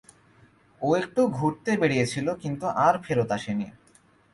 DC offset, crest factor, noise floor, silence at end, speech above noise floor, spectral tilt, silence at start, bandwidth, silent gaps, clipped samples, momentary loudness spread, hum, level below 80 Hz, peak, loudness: under 0.1%; 18 dB; -59 dBFS; 0.65 s; 35 dB; -6 dB/octave; 0.8 s; 11.5 kHz; none; under 0.1%; 9 LU; none; -60 dBFS; -8 dBFS; -26 LUFS